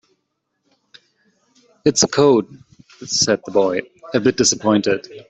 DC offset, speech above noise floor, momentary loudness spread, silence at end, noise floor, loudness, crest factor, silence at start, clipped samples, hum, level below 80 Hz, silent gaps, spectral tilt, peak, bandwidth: under 0.1%; 56 dB; 9 LU; 0.1 s; -73 dBFS; -17 LUFS; 16 dB; 1.85 s; under 0.1%; none; -58 dBFS; none; -3.5 dB/octave; -2 dBFS; 8.4 kHz